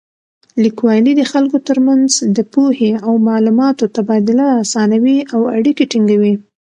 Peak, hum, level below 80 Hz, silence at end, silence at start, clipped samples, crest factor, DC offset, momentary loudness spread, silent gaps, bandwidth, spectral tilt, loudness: 0 dBFS; none; -62 dBFS; 0.25 s; 0.55 s; under 0.1%; 12 dB; under 0.1%; 3 LU; none; 10.5 kHz; -5 dB/octave; -13 LUFS